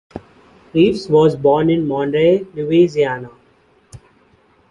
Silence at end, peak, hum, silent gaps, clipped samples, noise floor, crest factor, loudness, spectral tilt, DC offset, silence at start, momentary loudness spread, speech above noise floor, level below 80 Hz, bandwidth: 0.75 s; -2 dBFS; none; none; under 0.1%; -54 dBFS; 16 dB; -15 LUFS; -7.5 dB/octave; under 0.1%; 0.15 s; 9 LU; 40 dB; -50 dBFS; 10.5 kHz